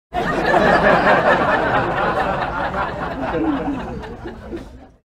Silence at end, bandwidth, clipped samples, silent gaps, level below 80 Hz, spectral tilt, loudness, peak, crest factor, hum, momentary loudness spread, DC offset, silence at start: 0.3 s; 14.5 kHz; under 0.1%; none; -36 dBFS; -6.5 dB/octave; -17 LUFS; -2 dBFS; 18 dB; none; 19 LU; under 0.1%; 0.1 s